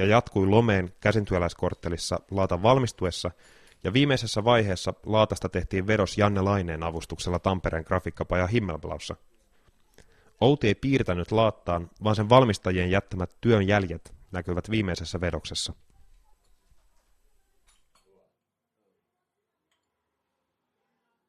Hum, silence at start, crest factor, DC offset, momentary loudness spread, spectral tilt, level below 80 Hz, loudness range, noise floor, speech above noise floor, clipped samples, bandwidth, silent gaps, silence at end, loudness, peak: none; 0 s; 22 dB; under 0.1%; 11 LU; -6 dB/octave; -48 dBFS; 9 LU; -82 dBFS; 57 dB; under 0.1%; 13 kHz; none; 5.55 s; -26 LUFS; -4 dBFS